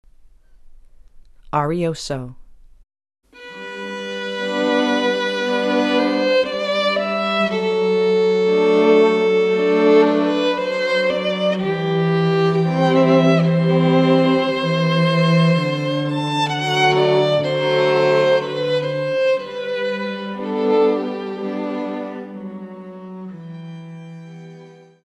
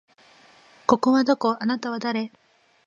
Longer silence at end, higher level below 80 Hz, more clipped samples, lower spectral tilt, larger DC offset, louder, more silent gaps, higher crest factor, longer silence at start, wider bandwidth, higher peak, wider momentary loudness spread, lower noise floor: second, 0.35 s vs 0.6 s; first, -54 dBFS vs -64 dBFS; neither; first, -6.5 dB/octave vs -5 dB/octave; neither; first, -18 LUFS vs -23 LUFS; neither; second, 16 dB vs 22 dB; second, 0.65 s vs 0.9 s; first, 10 kHz vs 7.4 kHz; about the same, -2 dBFS vs -2 dBFS; first, 19 LU vs 10 LU; second, -47 dBFS vs -54 dBFS